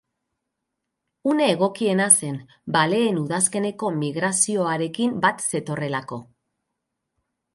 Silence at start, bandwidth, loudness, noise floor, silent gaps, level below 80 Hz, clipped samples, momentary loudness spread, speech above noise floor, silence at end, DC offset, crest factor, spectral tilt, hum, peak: 1.25 s; 12 kHz; -21 LUFS; -81 dBFS; none; -68 dBFS; under 0.1%; 12 LU; 59 dB; 1.3 s; under 0.1%; 24 dB; -3.5 dB/octave; none; 0 dBFS